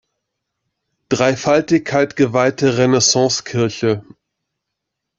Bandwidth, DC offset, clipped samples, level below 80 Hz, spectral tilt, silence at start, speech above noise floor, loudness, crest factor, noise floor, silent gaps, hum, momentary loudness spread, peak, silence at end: 8 kHz; under 0.1%; under 0.1%; -56 dBFS; -4 dB/octave; 1.1 s; 63 dB; -16 LUFS; 16 dB; -79 dBFS; none; none; 7 LU; -2 dBFS; 1.15 s